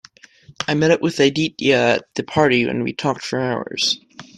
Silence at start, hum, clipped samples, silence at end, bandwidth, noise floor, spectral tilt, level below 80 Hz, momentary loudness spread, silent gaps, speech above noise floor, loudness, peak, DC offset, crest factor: 0.6 s; none; under 0.1%; 0.15 s; 12.5 kHz; -48 dBFS; -4.5 dB/octave; -58 dBFS; 7 LU; none; 30 dB; -19 LUFS; -2 dBFS; under 0.1%; 18 dB